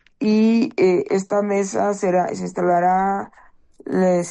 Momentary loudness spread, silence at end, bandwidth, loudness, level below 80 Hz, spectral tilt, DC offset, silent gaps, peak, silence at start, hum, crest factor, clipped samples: 8 LU; 0 s; 10 kHz; -19 LUFS; -60 dBFS; -6.5 dB/octave; under 0.1%; none; -8 dBFS; 0.2 s; none; 12 dB; under 0.1%